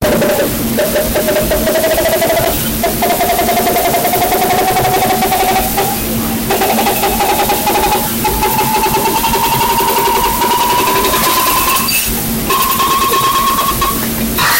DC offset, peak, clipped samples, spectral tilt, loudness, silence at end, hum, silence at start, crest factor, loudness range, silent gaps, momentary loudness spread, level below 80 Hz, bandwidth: under 0.1%; -2 dBFS; under 0.1%; -3 dB/octave; -12 LUFS; 0 s; none; 0 s; 10 dB; 1 LU; none; 3 LU; -30 dBFS; 16.5 kHz